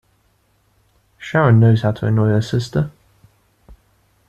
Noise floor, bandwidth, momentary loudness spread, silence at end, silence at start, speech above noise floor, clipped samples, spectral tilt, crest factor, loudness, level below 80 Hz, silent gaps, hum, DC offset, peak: -61 dBFS; 8.4 kHz; 11 LU; 0.55 s; 1.2 s; 46 dB; under 0.1%; -8 dB/octave; 16 dB; -16 LUFS; -48 dBFS; none; none; under 0.1%; -4 dBFS